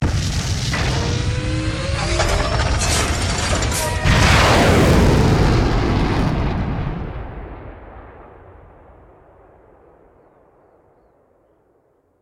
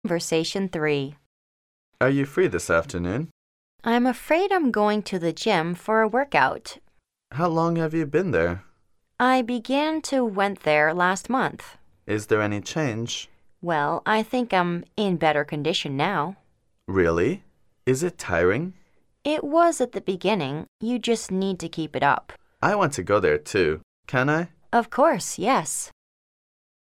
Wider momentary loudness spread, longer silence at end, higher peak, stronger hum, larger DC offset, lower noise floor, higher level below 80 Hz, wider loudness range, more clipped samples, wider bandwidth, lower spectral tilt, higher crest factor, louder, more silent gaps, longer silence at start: first, 18 LU vs 9 LU; first, 3.95 s vs 1 s; about the same, -2 dBFS vs -4 dBFS; neither; neither; about the same, -60 dBFS vs -63 dBFS; first, -26 dBFS vs -54 dBFS; first, 14 LU vs 2 LU; neither; about the same, 17 kHz vs 16 kHz; about the same, -5 dB/octave vs -5 dB/octave; about the same, 18 dB vs 20 dB; first, -17 LUFS vs -24 LUFS; second, none vs 1.26-1.92 s, 3.31-3.79 s, 20.68-20.79 s, 23.83-24.03 s; about the same, 0 s vs 0.05 s